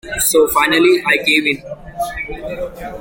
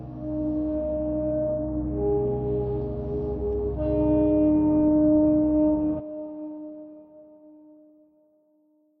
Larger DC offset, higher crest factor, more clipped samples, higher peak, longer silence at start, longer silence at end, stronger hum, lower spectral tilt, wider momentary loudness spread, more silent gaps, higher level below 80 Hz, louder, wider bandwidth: neither; about the same, 16 dB vs 14 dB; neither; first, 0 dBFS vs -12 dBFS; about the same, 0.05 s vs 0 s; second, 0 s vs 1.5 s; neither; second, -2.5 dB/octave vs -14 dB/octave; about the same, 14 LU vs 16 LU; neither; about the same, -38 dBFS vs -40 dBFS; first, -14 LUFS vs -24 LUFS; first, 17 kHz vs 2.9 kHz